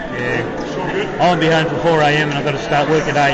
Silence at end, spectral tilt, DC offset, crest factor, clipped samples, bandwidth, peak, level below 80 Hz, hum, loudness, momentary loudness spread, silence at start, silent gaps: 0 s; -5.5 dB/octave; under 0.1%; 12 dB; under 0.1%; 8.2 kHz; -4 dBFS; -40 dBFS; none; -16 LUFS; 7 LU; 0 s; none